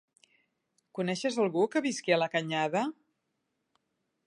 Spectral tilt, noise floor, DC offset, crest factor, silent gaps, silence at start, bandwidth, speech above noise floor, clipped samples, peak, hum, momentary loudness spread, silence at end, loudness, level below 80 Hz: -4.5 dB/octave; -81 dBFS; under 0.1%; 20 dB; none; 0.95 s; 11.5 kHz; 52 dB; under 0.1%; -12 dBFS; none; 8 LU; 1.35 s; -30 LUFS; -84 dBFS